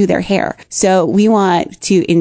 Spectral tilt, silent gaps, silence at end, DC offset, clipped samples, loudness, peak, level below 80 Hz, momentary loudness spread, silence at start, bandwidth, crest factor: -5 dB/octave; none; 0 s; under 0.1%; under 0.1%; -13 LUFS; 0 dBFS; -46 dBFS; 5 LU; 0 s; 8 kHz; 12 dB